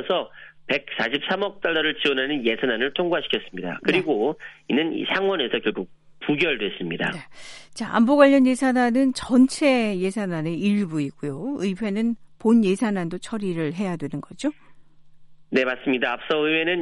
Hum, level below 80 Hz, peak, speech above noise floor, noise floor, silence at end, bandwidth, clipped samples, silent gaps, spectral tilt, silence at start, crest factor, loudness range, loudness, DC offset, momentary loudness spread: none; -60 dBFS; -2 dBFS; 24 dB; -46 dBFS; 0 s; 11.5 kHz; under 0.1%; none; -5 dB/octave; 0 s; 20 dB; 6 LU; -23 LUFS; under 0.1%; 11 LU